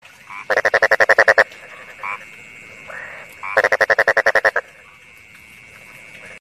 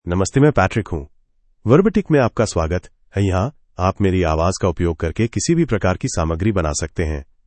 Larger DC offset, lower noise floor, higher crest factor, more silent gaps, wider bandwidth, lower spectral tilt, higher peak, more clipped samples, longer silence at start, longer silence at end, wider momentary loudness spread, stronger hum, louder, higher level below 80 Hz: neither; second, -45 dBFS vs -57 dBFS; about the same, 18 dB vs 18 dB; neither; first, 15 kHz vs 8.8 kHz; second, -2 dB/octave vs -6 dB/octave; about the same, 0 dBFS vs 0 dBFS; neither; first, 0.3 s vs 0.05 s; second, 0 s vs 0.25 s; first, 25 LU vs 10 LU; neither; first, -15 LUFS vs -19 LUFS; second, -58 dBFS vs -36 dBFS